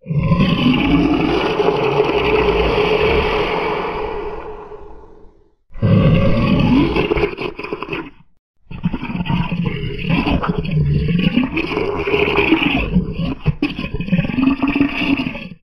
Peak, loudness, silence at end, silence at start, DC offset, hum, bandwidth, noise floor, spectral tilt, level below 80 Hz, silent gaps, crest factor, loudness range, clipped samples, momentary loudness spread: 0 dBFS; -17 LUFS; 0.05 s; 0.05 s; under 0.1%; none; 12.5 kHz; -45 dBFS; -8 dB/octave; -30 dBFS; 8.39-8.54 s; 16 dB; 5 LU; under 0.1%; 11 LU